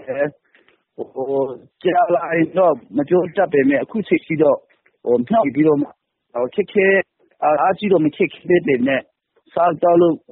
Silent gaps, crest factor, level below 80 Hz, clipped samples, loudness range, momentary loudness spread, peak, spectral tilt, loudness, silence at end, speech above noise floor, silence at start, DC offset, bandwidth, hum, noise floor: none; 14 dB; -62 dBFS; under 0.1%; 2 LU; 10 LU; -4 dBFS; -5.5 dB/octave; -18 LUFS; 0.15 s; 40 dB; 0 s; under 0.1%; 4.1 kHz; none; -57 dBFS